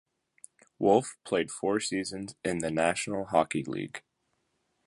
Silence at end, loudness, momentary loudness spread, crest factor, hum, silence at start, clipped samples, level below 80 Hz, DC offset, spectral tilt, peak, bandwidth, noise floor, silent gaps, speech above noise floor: 0.85 s; -30 LUFS; 12 LU; 22 dB; none; 0.8 s; under 0.1%; -64 dBFS; under 0.1%; -4.5 dB/octave; -10 dBFS; 11.5 kHz; -77 dBFS; none; 48 dB